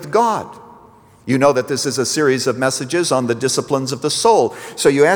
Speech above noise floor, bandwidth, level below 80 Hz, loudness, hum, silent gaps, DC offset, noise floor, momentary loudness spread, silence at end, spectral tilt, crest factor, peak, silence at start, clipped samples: 30 dB; over 20 kHz; -60 dBFS; -17 LUFS; none; none; under 0.1%; -46 dBFS; 7 LU; 0 s; -4 dB/octave; 16 dB; -2 dBFS; 0 s; under 0.1%